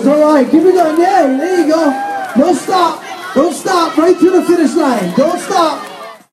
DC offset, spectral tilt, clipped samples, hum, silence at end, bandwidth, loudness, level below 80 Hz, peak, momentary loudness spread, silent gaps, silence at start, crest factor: under 0.1%; -5 dB/octave; under 0.1%; none; 0.15 s; 14.5 kHz; -11 LUFS; -56 dBFS; 0 dBFS; 7 LU; none; 0 s; 12 dB